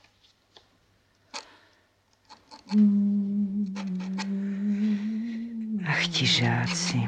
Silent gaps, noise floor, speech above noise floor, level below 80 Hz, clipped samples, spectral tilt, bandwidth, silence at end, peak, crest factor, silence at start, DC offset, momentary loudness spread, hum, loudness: none; -66 dBFS; 43 dB; -64 dBFS; under 0.1%; -4.5 dB/octave; 9.4 kHz; 0 s; -12 dBFS; 16 dB; 1.35 s; under 0.1%; 12 LU; none; -26 LUFS